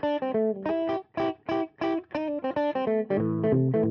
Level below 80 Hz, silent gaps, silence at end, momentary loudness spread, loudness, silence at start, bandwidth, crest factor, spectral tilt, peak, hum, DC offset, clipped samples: -62 dBFS; none; 0 s; 6 LU; -28 LUFS; 0 s; 6.4 kHz; 14 dB; -9.5 dB/octave; -14 dBFS; none; under 0.1%; under 0.1%